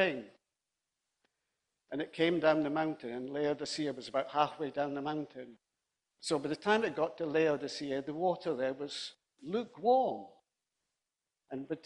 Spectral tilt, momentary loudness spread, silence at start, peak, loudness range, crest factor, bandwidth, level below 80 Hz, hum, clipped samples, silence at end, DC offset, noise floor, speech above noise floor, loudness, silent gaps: -5 dB/octave; 15 LU; 0 s; -14 dBFS; 3 LU; 20 dB; 10.5 kHz; -76 dBFS; none; under 0.1%; 0.05 s; under 0.1%; -90 dBFS; 56 dB; -34 LUFS; none